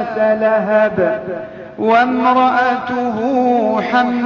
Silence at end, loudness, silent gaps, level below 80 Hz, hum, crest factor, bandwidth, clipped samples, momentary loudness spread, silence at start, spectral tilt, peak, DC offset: 0 s; -15 LUFS; none; -56 dBFS; none; 14 dB; 7 kHz; under 0.1%; 9 LU; 0 s; -7 dB/octave; 0 dBFS; under 0.1%